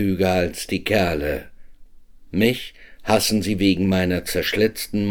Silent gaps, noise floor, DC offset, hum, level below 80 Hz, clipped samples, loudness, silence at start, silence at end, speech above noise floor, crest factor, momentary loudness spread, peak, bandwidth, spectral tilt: none; -43 dBFS; under 0.1%; none; -42 dBFS; under 0.1%; -21 LUFS; 0 s; 0 s; 23 dB; 18 dB; 10 LU; -4 dBFS; 19.5 kHz; -5 dB/octave